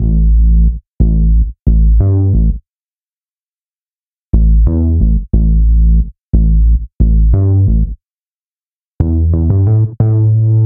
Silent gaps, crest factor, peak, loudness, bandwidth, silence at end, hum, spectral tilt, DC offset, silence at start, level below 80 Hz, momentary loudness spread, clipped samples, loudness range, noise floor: 0.94-0.98 s, 1.61-1.66 s, 2.69-2.85 s, 2.93-3.54 s, 3.61-4.31 s, 6.23-6.32 s, 6.95-6.99 s, 8.10-8.99 s; 10 dB; 0 dBFS; -12 LUFS; 1.3 kHz; 0 s; none; -16 dB/octave; under 0.1%; 0 s; -12 dBFS; 5 LU; under 0.1%; 3 LU; under -90 dBFS